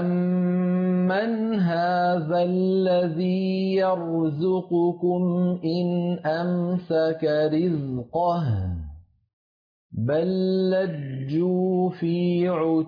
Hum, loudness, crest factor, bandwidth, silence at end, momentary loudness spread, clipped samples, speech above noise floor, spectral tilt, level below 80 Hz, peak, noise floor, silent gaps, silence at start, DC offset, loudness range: none; -24 LUFS; 10 dB; 5.2 kHz; 0 s; 4 LU; under 0.1%; over 67 dB; -10 dB/octave; -54 dBFS; -14 dBFS; under -90 dBFS; 9.33-9.90 s; 0 s; under 0.1%; 4 LU